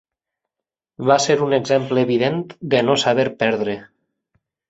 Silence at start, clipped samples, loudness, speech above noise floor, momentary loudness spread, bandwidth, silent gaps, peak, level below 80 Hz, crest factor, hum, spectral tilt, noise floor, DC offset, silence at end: 1 s; under 0.1%; -18 LUFS; 68 dB; 8 LU; 8 kHz; none; -2 dBFS; -60 dBFS; 18 dB; none; -4.5 dB/octave; -86 dBFS; under 0.1%; 0.85 s